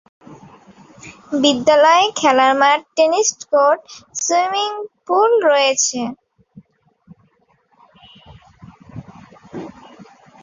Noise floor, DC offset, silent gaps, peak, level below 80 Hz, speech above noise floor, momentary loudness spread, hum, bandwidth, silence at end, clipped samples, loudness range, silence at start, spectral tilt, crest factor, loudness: -59 dBFS; under 0.1%; none; -2 dBFS; -60 dBFS; 44 dB; 21 LU; none; 7.8 kHz; 0.4 s; under 0.1%; 7 LU; 0.3 s; -2 dB/octave; 18 dB; -15 LUFS